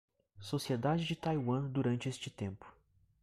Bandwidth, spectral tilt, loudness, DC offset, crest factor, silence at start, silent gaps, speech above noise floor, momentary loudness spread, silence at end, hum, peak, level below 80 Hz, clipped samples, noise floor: 14.5 kHz; -6.5 dB/octave; -36 LUFS; under 0.1%; 16 dB; 0.35 s; none; 34 dB; 10 LU; 0.5 s; none; -22 dBFS; -66 dBFS; under 0.1%; -70 dBFS